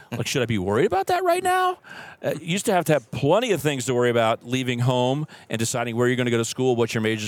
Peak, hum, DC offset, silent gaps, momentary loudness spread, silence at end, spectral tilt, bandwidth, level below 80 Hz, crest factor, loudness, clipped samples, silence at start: -4 dBFS; none; under 0.1%; none; 7 LU; 0 s; -5 dB/octave; 18.5 kHz; -62 dBFS; 18 dB; -23 LUFS; under 0.1%; 0 s